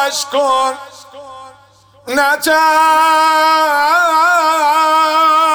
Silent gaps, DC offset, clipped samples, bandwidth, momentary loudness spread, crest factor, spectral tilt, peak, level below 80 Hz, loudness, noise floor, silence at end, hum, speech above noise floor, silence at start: none; under 0.1%; under 0.1%; over 20 kHz; 5 LU; 10 dB; -0.5 dB/octave; -4 dBFS; -58 dBFS; -11 LUFS; -46 dBFS; 0 s; none; 34 dB; 0 s